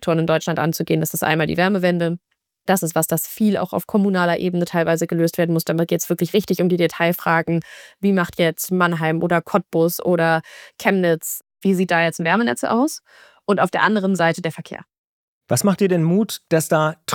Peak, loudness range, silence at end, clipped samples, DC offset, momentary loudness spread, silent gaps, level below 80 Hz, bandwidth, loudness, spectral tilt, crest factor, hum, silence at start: -2 dBFS; 1 LU; 0 s; under 0.1%; under 0.1%; 6 LU; 14.98-15.41 s; -60 dBFS; 19.5 kHz; -19 LUFS; -5.5 dB/octave; 18 dB; none; 0 s